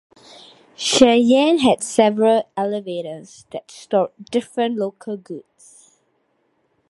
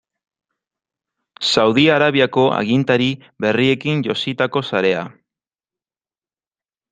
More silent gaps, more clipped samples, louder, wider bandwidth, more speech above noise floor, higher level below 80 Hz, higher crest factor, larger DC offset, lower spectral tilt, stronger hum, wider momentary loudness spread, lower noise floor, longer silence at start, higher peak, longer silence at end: neither; neither; about the same, -18 LUFS vs -17 LUFS; first, 11.5 kHz vs 9.4 kHz; second, 48 dB vs over 74 dB; about the same, -60 dBFS vs -60 dBFS; about the same, 20 dB vs 18 dB; neither; second, -4 dB/octave vs -5.5 dB/octave; neither; first, 21 LU vs 9 LU; second, -66 dBFS vs under -90 dBFS; second, 0.8 s vs 1.4 s; about the same, 0 dBFS vs 0 dBFS; second, 1.5 s vs 1.8 s